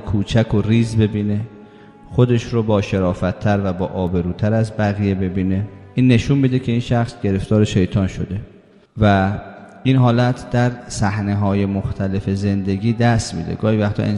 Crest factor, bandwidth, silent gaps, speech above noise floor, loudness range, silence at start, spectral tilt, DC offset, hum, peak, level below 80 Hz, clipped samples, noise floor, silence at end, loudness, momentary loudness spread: 18 dB; 11 kHz; none; 25 dB; 1 LU; 0 s; -7.5 dB/octave; under 0.1%; none; 0 dBFS; -40 dBFS; under 0.1%; -42 dBFS; 0 s; -18 LUFS; 7 LU